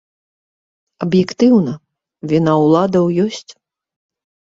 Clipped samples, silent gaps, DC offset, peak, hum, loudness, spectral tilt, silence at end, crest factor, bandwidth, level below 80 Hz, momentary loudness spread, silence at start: under 0.1%; none; under 0.1%; -2 dBFS; none; -15 LUFS; -7.5 dB/octave; 1.1 s; 16 dB; 7.8 kHz; -56 dBFS; 16 LU; 1 s